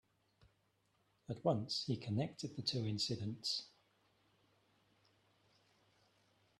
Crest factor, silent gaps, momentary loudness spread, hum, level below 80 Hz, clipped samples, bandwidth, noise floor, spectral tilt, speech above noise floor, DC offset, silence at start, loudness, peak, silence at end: 24 dB; none; 5 LU; none; -78 dBFS; under 0.1%; 12.5 kHz; -79 dBFS; -5.5 dB/octave; 39 dB; under 0.1%; 1.3 s; -40 LUFS; -20 dBFS; 2.9 s